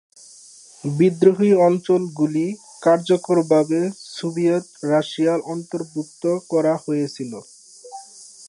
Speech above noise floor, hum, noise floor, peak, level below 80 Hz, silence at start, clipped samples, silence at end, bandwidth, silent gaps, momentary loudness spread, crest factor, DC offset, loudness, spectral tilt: 27 dB; none; -46 dBFS; -2 dBFS; -72 dBFS; 0.85 s; under 0.1%; 0 s; 11.5 kHz; none; 16 LU; 18 dB; under 0.1%; -20 LUFS; -6.5 dB/octave